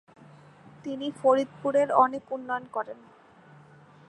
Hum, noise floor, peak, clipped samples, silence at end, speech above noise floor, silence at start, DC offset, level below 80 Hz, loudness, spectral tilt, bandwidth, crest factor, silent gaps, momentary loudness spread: none; -54 dBFS; -6 dBFS; under 0.1%; 1.15 s; 27 dB; 0.85 s; under 0.1%; -76 dBFS; -27 LUFS; -5.5 dB/octave; 10.5 kHz; 22 dB; none; 16 LU